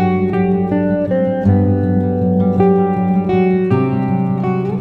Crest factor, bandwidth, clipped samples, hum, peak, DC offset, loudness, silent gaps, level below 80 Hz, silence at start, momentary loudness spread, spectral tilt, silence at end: 12 dB; 4.3 kHz; under 0.1%; none; -2 dBFS; under 0.1%; -15 LUFS; none; -44 dBFS; 0 s; 4 LU; -11 dB/octave; 0 s